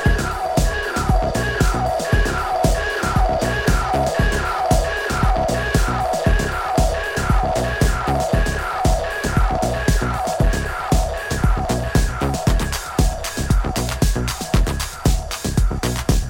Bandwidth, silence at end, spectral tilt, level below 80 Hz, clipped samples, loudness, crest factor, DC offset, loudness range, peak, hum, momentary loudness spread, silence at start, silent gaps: 17 kHz; 0 s; -5 dB/octave; -22 dBFS; under 0.1%; -20 LUFS; 16 dB; under 0.1%; 2 LU; -4 dBFS; none; 3 LU; 0 s; none